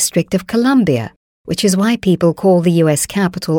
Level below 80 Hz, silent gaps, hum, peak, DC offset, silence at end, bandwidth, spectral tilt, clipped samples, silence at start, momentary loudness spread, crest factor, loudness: -48 dBFS; 1.16-1.45 s; none; -2 dBFS; under 0.1%; 0 s; 19 kHz; -5.5 dB/octave; under 0.1%; 0 s; 6 LU; 12 dB; -14 LUFS